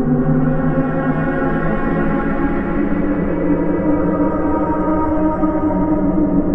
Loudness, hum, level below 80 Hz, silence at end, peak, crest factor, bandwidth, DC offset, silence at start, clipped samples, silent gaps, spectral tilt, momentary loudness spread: -17 LUFS; none; -26 dBFS; 0 s; -4 dBFS; 12 dB; 3.8 kHz; under 0.1%; 0 s; under 0.1%; none; -11.5 dB/octave; 2 LU